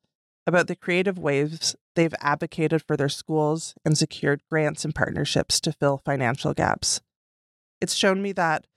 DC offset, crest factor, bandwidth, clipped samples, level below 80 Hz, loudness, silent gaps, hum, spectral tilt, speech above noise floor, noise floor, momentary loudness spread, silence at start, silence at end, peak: under 0.1%; 20 dB; 15 kHz; under 0.1%; -54 dBFS; -24 LUFS; 1.81-1.95 s, 7.16-7.81 s; none; -4 dB/octave; over 66 dB; under -90 dBFS; 4 LU; 0.45 s; 0.15 s; -6 dBFS